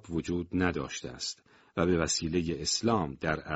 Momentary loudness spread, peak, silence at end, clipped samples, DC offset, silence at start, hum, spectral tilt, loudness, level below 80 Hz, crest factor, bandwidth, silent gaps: 10 LU; -12 dBFS; 0 s; under 0.1%; under 0.1%; 0.05 s; none; -4.5 dB/octave; -31 LUFS; -50 dBFS; 20 dB; 8 kHz; none